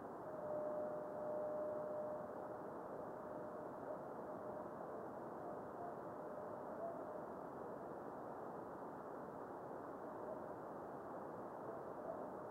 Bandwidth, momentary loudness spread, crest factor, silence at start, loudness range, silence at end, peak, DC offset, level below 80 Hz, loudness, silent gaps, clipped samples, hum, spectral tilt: 16.5 kHz; 6 LU; 16 dB; 0 s; 4 LU; 0 s; -34 dBFS; under 0.1%; -82 dBFS; -49 LUFS; none; under 0.1%; none; -8 dB/octave